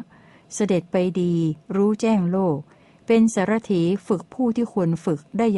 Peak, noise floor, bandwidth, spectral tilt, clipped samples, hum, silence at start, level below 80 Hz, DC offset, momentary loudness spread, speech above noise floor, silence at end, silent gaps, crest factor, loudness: -8 dBFS; -47 dBFS; 11.5 kHz; -7 dB/octave; under 0.1%; none; 0 s; -60 dBFS; under 0.1%; 7 LU; 26 dB; 0 s; none; 14 dB; -22 LUFS